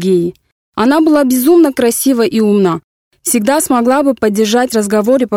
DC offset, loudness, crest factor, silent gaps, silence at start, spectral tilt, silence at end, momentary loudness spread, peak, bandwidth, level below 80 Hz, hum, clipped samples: under 0.1%; -11 LUFS; 10 dB; 0.52-0.73 s, 2.84-3.11 s; 0 s; -4.5 dB/octave; 0 s; 6 LU; 0 dBFS; 18 kHz; -50 dBFS; none; under 0.1%